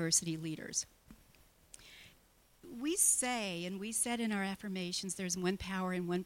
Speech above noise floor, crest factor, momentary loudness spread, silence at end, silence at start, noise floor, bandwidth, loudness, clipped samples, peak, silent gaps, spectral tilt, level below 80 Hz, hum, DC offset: 31 dB; 22 dB; 21 LU; 0 s; 0 s; -67 dBFS; 16.5 kHz; -35 LUFS; under 0.1%; -16 dBFS; none; -3 dB/octave; -64 dBFS; none; under 0.1%